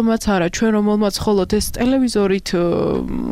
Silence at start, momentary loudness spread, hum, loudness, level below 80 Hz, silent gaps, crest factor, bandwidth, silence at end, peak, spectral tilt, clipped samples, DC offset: 0 s; 3 LU; none; -18 LUFS; -34 dBFS; none; 10 dB; 15.5 kHz; 0 s; -8 dBFS; -5.5 dB/octave; under 0.1%; under 0.1%